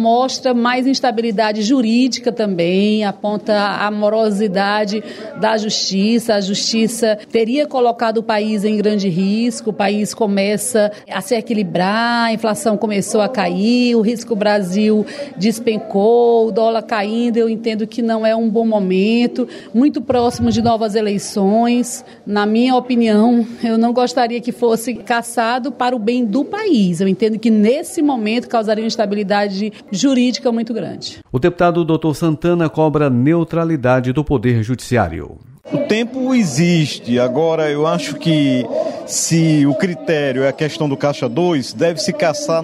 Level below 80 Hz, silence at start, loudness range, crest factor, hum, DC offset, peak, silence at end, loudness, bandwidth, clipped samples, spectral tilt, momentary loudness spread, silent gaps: -48 dBFS; 0 s; 2 LU; 14 dB; none; under 0.1%; -2 dBFS; 0 s; -16 LUFS; 13.5 kHz; under 0.1%; -5.5 dB/octave; 5 LU; none